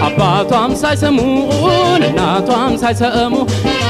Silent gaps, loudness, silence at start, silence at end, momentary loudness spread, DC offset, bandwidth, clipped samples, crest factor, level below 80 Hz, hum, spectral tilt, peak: none; -13 LUFS; 0 s; 0 s; 3 LU; under 0.1%; 15 kHz; under 0.1%; 12 dB; -36 dBFS; none; -5.5 dB/octave; 0 dBFS